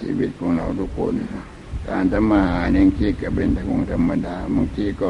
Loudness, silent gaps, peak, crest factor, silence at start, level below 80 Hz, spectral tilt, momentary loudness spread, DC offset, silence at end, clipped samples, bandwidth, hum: -21 LUFS; none; -4 dBFS; 16 dB; 0 s; -32 dBFS; -8.5 dB/octave; 10 LU; under 0.1%; 0 s; under 0.1%; 10.5 kHz; none